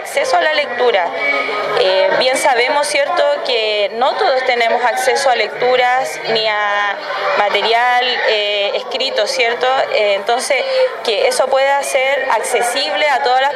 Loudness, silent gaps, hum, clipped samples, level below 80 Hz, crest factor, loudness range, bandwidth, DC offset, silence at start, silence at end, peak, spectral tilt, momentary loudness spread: -14 LUFS; none; none; under 0.1%; -68 dBFS; 14 dB; 1 LU; 14.5 kHz; under 0.1%; 0 s; 0 s; -2 dBFS; -0.5 dB/octave; 3 LU